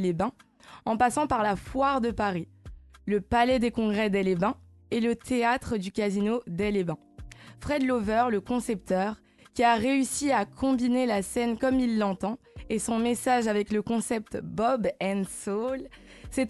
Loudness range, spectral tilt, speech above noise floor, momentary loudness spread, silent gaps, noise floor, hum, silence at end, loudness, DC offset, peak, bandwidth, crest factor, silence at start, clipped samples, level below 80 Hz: 3 LU; -5 dB/octave; 20 dB; 11 LU; none; -47 dBFS; none; 0 s; -27 LUFS; under 0.1%; -10 dBFS; 12.5 kHz; 18 dB; 0 s; under 0.1%; -50 dBFS